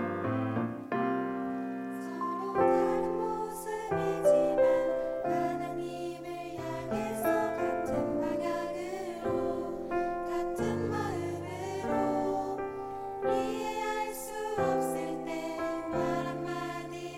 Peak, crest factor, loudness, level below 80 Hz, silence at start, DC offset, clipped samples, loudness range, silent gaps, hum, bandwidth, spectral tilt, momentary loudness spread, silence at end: -14 dBFS; 18 dB; -32 LUFS; -58 dBFS; 0 s; under 0.1%; under 0.1%; 4 LU; none; none; 16 kHz; -6 dB/octave; 10 LU; 0 s